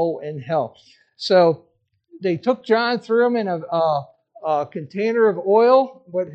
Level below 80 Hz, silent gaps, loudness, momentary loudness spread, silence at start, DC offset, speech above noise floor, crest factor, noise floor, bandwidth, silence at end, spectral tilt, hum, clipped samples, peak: -74 dBFS; none; -20 LUFS; 13 LU; 0 s; under 0.1%; 30 dB; 16 dB; -49 dBFS; 8.2 kHz; 0 s; -6.5 dB/octave; none; under 0.1%; -4 dBFS